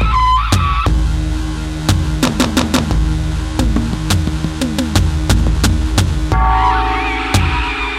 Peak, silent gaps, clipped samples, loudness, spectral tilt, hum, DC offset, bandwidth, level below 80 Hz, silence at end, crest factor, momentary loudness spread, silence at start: 0 dBFS; none; under 0.1%; -15 LUFS; -5 dB/octave; none; under 0.1%; 15.5 kHz; -18 dBFS; 0 s; 14 dB; 6 LU; 0 s